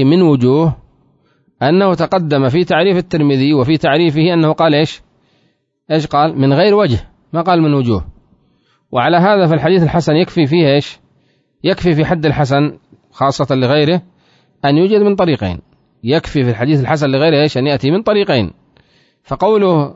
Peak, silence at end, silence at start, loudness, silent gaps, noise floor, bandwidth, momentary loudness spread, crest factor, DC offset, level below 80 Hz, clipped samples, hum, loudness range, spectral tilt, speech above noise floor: 0 dBFS; 0 s; 0 s; -13 LUFS; none; -60 dBFS; 7.8 kHz; 8 LU; 14 dB; under 0.1%; -42 dBFS; under 0.1%; none; 2 LU; -7.5 dB/octave; 48 dB